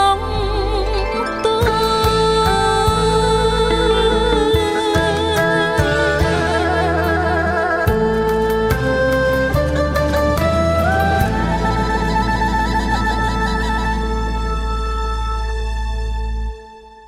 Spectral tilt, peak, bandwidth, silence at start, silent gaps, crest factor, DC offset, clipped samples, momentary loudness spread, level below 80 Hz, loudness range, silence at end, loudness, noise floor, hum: -5.5 dB/octave; -2 dBFS; 16 kHz; 0 s; none; 14 dB; under 0.1%; under 0.1%; 7 LU; -24 dBFS; 5 LU; 0 s; -17 LUFS; -38 dBFS; none